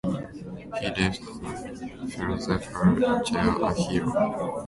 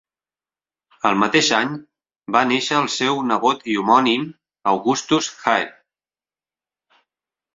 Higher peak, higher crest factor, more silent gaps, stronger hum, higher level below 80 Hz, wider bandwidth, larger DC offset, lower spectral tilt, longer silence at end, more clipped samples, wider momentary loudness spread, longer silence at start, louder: second, -8 dBFS vs 0 dBFS; about the same, 18 dB vs 20 dB; neither; neither; first, -46 dBFS vs -64 dBFS; first, 11.5 kHz vs 7.8 kHz; neither; first, -6 dB/octave vs -3.5 dB/octave; second, 0 s vs 1.85 s; neither; first, 13 LU vs 8 LU; second, 0.05 s vs 1.05 s; second, -27 LUFS vs -19 LUFS